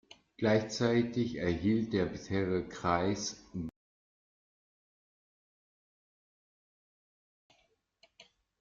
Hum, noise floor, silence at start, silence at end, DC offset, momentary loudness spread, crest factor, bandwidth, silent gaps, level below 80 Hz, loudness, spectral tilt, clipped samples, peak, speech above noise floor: none; -74 dBFS; 0.4 s; 0.4 s; under 0.1%; 11 LU; 22 dB; 7.6 kHz; 3.76-7.50 s; -62 dBFS; -33 LUFS; -5.5 dB/octave; under 0.1%; -14 dBFS; 42 dB